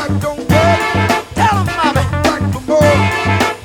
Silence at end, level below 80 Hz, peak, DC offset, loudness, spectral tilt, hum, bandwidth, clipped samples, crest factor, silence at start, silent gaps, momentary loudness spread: 0 s; -32 dBFS; 0 dBFS; under 0.1%; -13 LUFS; -5.5 dB/octave; none; 18 kHz; under 0.1%; 12 dB; 0 s; none; 4 LU